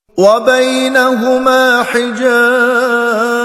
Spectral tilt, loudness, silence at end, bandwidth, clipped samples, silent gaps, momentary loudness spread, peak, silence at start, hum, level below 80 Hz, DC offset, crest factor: -3.5 dB/octave; -10 LUFS; 0 s; 15 kHz; 0.2%; none; 3 LU; 0 dBFS; 0.15 s; none; -54 dBFS; under 0.1%; 10 dB